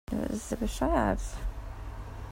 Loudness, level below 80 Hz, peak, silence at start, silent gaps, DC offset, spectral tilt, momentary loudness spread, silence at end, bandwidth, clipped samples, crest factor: -32 LUFS; -38 dBFS; -12 dBFS; 0.1 s; none; under 0.1%; -6 dB/octave; 15 LU; 0 s; 16 kHz; under 0.1%; 20 dB